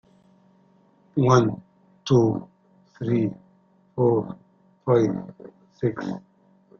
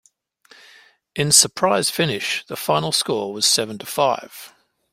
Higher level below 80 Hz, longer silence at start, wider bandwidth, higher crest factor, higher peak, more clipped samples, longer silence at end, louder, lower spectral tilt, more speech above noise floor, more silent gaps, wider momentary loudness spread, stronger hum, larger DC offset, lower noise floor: about the same, -58 dBFS vs -60 dBFS; about the same, 1.15 s vs 1.15 s; second, 7 kHz vs 16.5 kHz; about the same, 20 dB vs 22 dB; second, -6 dBFS vs 0 dBFS; neither; first, 0.6 s vs 0.45 s; second, -23 LUFS vs -18 LUFS; first, -7.5 dB/octave vs -2 dB/octave; first, 38 dB vs 34 dB; neither; first, 19 LU vs 14 LU; neither; neither; first, -59 dBFS vs -54 dBFS